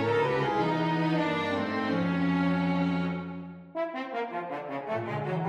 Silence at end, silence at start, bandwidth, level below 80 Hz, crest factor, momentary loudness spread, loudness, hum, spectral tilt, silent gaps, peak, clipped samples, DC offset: 0 s; 0 s; 8 kHz; -62 dBFS; 14 dB; 9 LU; -29 LUFS; none; -7.5 dB/octave; none; -14 dBFS; under 0.1%; under 0.1%